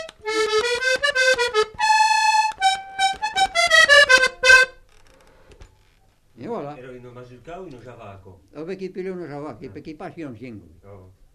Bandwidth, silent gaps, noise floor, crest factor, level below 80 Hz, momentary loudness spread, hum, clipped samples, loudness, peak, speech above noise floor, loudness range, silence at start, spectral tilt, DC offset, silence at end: 14 kHz; none; -58 dBFS; 18 dB; -52 dBFS; 25 LU; none; under 0.1%; -16 LUFS; -2 dBFS; 23 dB; 22 LU; 0 s; -1 dB/octave; under 0.1%; 0.35 s